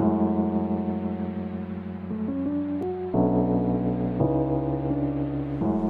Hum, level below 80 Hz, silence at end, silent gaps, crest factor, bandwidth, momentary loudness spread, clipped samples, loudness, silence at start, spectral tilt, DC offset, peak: none; -46 dBFS; 0 s; none; 16 dB; 4.5 kHz; 9 LU; under 0.1%; -27 LUFS; 0 s; -12 dB/octave; under 0.1%; -10 dBFS